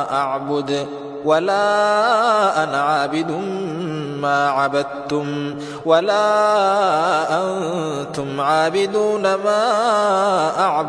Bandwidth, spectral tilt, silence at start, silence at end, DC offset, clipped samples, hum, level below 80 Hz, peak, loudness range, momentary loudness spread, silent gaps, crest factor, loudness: 11 kHz; -4.5 dB/octave; 0 s; 0 s; under 0.1%; under 0.1%; none; -62 dBFS; -2 dBFS; 2 LU; 9 LU; none; 16 dB; -18 LUFS